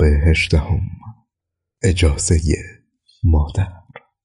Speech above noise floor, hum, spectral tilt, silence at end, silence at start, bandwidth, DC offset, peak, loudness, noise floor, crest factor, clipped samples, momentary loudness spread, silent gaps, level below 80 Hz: 65 dB; none; -5.5 dB/octave; 0.25 s; 0 s; 11 kHz; under 0.1%; -4 dBFS; -18 LUFS; -81 dBFS; 14 dB; under 0.1%; 12 LU; none; -22 dBFS